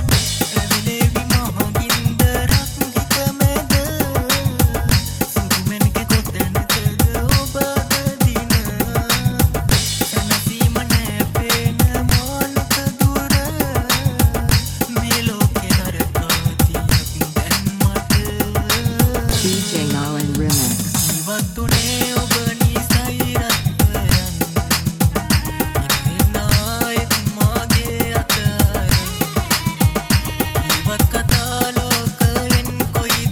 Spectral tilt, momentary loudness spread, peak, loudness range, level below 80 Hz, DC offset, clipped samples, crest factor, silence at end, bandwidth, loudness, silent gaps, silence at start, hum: -4 dB/octave; 4 LU; 0 dBFS; 1 LU; -26 dBFS; under 0.1%; under 0.1%; 16 dB; 0 s; 17.5 kHz; -17 LUFS; none; 0 s; none